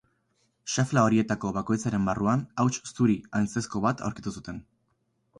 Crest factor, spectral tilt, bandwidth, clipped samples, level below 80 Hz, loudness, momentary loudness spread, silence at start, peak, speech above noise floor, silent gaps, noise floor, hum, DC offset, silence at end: 20 dB; -6 dB/octave; 11 kHz; under 0.1%; -56 dBFS; -27 LUFS; 13 LU; 0.65 s; -8 dBFS; 47 dB; none; -73 dBFS; none; under 0.1%; 0.8 s